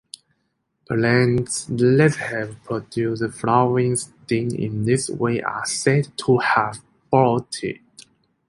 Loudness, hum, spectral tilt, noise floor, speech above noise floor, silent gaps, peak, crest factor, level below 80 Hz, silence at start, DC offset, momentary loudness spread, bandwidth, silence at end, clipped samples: -21 LUFS; none; -5.5 dB/octave; -72 dBFS; 52 dB; none; -2 dBFS; 18 dB; -54 dBFS; 0.9 s; under 0.1%; 11 LU; 11.5 kHz; 0.5 s; under 0.1%